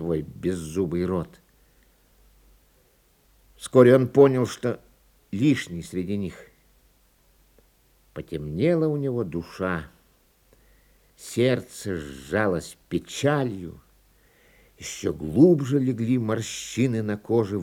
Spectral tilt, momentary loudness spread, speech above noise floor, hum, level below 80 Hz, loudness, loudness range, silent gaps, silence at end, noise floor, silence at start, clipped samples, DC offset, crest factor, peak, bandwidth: -6.5 dB/octave; 18 LU; 38 dB; none; -56 dBFS; -24 LUFS; 9 LU; none; 0 s; -62 dBFS; 0 s; under 0.1%; under 0.1%; 24 dB; -2 dBFS; 17 kHz